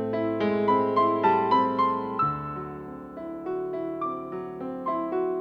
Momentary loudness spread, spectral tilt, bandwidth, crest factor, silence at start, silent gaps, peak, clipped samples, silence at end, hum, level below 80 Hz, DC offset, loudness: 14 LU; -8.5 dB/octave; 6.6 kHz; 16 dB; 0 s; none; -10 dBFS; under 0.1%; 0 s; none; -60 dBFS; under 0.1%; -26 LUFS